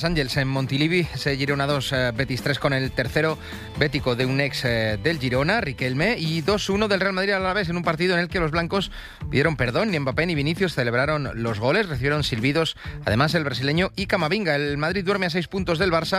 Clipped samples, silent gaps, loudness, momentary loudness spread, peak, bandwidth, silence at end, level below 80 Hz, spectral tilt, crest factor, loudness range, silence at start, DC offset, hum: under 0.1%; none; -23 LUFS; 4 LU; -6 dBFS; 15.5 kHz; 0 s; -42 dBFS; -5.5 dB/octave; 18 dB; 1 LU; 0 s; under 0.1%; none